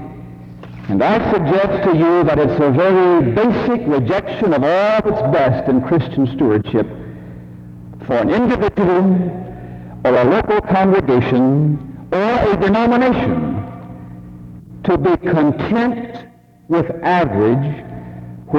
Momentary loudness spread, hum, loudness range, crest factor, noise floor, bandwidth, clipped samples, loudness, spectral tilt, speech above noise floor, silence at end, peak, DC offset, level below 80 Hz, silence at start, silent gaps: 21 LU; none; 4 LU; 14 dB; -42 dBFS; 7 kHz; under 0.1%; -15 LUFS; -9 dB/octave; 28 dB; 0 s; -2 dBFS; under 0.1%; -40 dBFS; 0 s; none